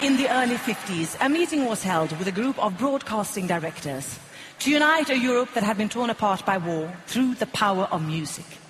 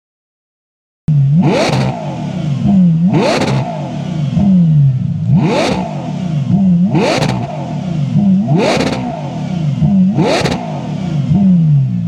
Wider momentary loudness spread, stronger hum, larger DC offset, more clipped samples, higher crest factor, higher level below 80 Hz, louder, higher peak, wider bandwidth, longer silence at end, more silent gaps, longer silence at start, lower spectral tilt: about the same, 10 LU vs 10 LU; neither; neither; neither; first, 18 dB vs 12 dB; second, -62 dBFS vs -42 dBFS; second, -24 LUFS vs -13 LUFS; second, -6 dBFS vs 0 dBFS; first, 13.5 kHz vs 10.5 kHz; about the same, 0 s vs 0 s; neither; second, 0 s vs 1.1 s; second, -4.5 dB/octave vs -7.5 dB/octave